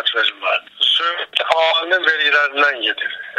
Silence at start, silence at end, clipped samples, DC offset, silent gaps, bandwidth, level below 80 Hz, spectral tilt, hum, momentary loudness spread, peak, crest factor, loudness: 0 s; 0 s; under 0.1%; under 0.1%; none; 11 kHz; -70 dBFS; 0 dB/octave; none; 6 LU; 0 dBFS; 18 dB; -16 LUFS